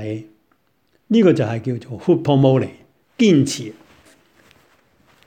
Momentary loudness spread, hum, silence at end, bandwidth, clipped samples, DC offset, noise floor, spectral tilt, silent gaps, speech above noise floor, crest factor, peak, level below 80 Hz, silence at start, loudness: 15 LU; none; 1.55 s; 13.5 kHz; under 0.1%; under 0.1%; -64 dBFS; -6.5 dB/octave; none; 47 dB; 18 dB; -2 dBFS; -60 dBFS; 0 s; -18 LUFS